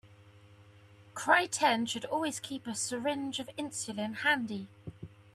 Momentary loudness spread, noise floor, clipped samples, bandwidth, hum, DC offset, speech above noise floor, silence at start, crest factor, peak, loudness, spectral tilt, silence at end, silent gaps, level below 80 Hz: 19 LU; -57 dBFS; under 0.1%; 14.5 kHz; none; under 0.1%; 25 dB; 0.05 s; 24 dB; -10 dBFS; -32 LUFS; -2.5 dB/octave; 0.2 s; none; -74 dBFS